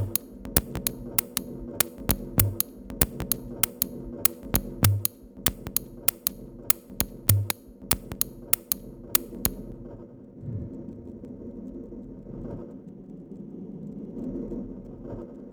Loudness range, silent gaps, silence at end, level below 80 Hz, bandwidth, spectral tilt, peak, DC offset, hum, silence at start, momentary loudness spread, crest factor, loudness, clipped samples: 14 LU; none; 0 s; -44 dBFS; over 20 kHz; -3.5 dB/octave; 0 dBFS; under 0.1%; none; 0 s; 18 LU; 30 dB; -27 LUFS; under 0.1%